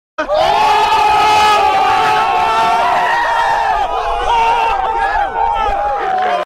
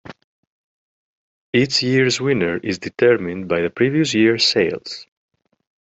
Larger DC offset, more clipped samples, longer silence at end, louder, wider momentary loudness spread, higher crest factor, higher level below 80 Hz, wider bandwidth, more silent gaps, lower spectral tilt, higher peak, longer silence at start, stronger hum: neither; neither; second, 0 s vs 0.85 s; first, -13 LUFS vs -18 LUFS; second, 6 LU vs 9 LU; second, 10 dB vs 18 dB; first, -34 dBFS vs -60 dBFS; first, 16 kHz vs 8.2 kHz; second, none vs 0.24-1.53 s; second, -2.5 dB/octave vs -4.5 dB/octave; about the same, -2 dBFS vs -2 dBFS; first, 0.2 s vs 0.05 s; neither